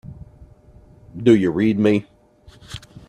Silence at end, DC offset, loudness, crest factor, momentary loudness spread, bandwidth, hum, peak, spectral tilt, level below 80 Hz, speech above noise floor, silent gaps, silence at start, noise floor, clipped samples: 0.3 s; under 0.1%; -18 LUFS; 18 dB; 23 LU; 10.5 kHz; none; -2 dBFS; -7.5 dB/octave; -50 dBFS; 31 dB; none; 0.05 s; -48 dBFS; under 0.1%